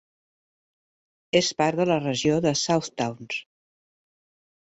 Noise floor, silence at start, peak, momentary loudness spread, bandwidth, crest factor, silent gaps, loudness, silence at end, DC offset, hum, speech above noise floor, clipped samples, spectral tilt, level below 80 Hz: under -90 dBFS; 1.35 s; -6 dBFS; 10 LU; 8.2 kHz; 20 dB; none; -24 LUFS; 1.25 s; under 0.1%; none; over 66 dB; under 0.1%; -4.5 dB/octave; -64 dBFS